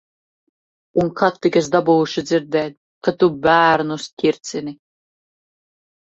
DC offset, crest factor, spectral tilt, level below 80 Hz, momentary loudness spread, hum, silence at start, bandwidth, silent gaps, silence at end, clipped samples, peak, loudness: under 0.1%; 18 dB; -5.5 dB/octave; -58 dBFS; 12 LU; none; 0.95 s; 8 kHz; 2.77-3.01 s, 4.13-4.17 s; 1.4 s; under 0.1%; -2 dBFS; -18 LUFS